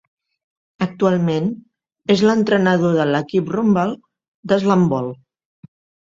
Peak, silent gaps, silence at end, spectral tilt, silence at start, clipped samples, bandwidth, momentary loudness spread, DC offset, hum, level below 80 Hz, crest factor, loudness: -2 dBFS; 4.28-4.43 s; 1 s; -7 dB/octave; 0.8 s; under 0.1%; 7.6 kHz; 13 LU; under 0.1%; none; -58 dBFS; 18 dB; -18 LUFS